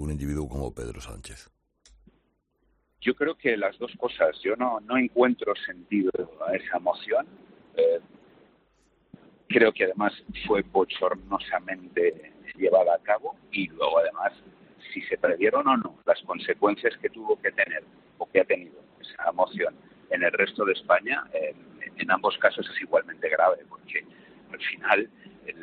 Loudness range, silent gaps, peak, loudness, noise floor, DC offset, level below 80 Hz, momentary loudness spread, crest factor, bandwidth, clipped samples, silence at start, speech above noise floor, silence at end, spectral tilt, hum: 4 LU; none; -4 dBFS; -26 LUFS; -71 dBFS; under 0.1%; -52 dBFS; 12 LU; 22 dB; 11.5 kHz; under 0.1%; 0 s; 45 dB; 0 s; -6 dB/octave; none